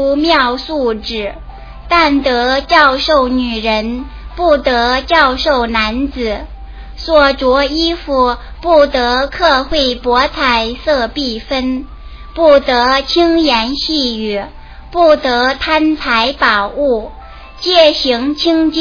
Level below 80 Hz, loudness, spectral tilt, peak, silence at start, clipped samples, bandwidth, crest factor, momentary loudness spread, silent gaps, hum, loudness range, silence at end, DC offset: -30 dBFS; -12 LUFS; -4.5 dB/octave; 0 dBFS; 0 s; under 0.1%; 5.4 kHz; 12 dB; 11 LU; none; none; 2 LU; 0 s; under 0.1%